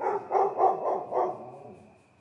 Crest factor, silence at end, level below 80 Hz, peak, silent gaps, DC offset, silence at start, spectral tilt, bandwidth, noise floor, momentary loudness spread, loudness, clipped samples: 18 dB; 0.45 s; -82 dBFS; -12 dBFS; none; under 0.1%; 0 s; -7.5 dB/octave; 6.8 kHz; -53 dBFS; 19 LU; -27 LUFS; under 0.1%